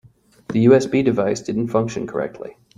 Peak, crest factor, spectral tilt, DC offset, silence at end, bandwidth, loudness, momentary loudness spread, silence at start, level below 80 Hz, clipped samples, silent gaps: -2 dBFS; 18 dB; -7 dB/octave; under 0.1%; 0.3 s; 11 kHz; -19 LUFS; 12 LU; 0.5 s; -56 dBFS; under 0.1%; none